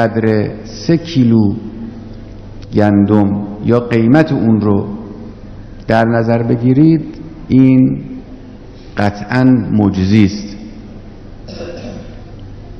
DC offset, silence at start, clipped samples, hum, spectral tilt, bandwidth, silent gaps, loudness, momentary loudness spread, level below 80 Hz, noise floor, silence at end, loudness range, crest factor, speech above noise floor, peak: under 0.1%; 0 s; 0.3%; none; -8.5 dB/octave; 6.6 kHz; none; -12 LUFS; 23 LU; -36 dBFS; -33 dBFS; 0 s; 2 LU; 14 dB; 22 dB; 0 dBFS